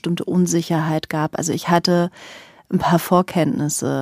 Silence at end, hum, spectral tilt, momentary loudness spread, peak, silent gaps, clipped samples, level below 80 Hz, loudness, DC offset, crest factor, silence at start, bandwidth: 0 s; none; -5.5 dB/octave; 7 LU; -2 dBFS; none; under 0.1%; -56 dBFS; -19 LUFS; under 0.1%; 18 dB; 0.05 s; 15.5 kHz